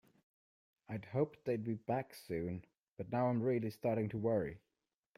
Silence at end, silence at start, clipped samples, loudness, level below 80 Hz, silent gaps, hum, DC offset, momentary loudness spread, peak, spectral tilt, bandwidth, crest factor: 0.6 s; 0.9 s; under 0.1%; -39 LUFS; -70 dBFS; 2.79-2.92 s; none; under 0.1%; 12 LU; -22 dBFS; -8.5 dB/octave; 15.5 kHz; 18 dB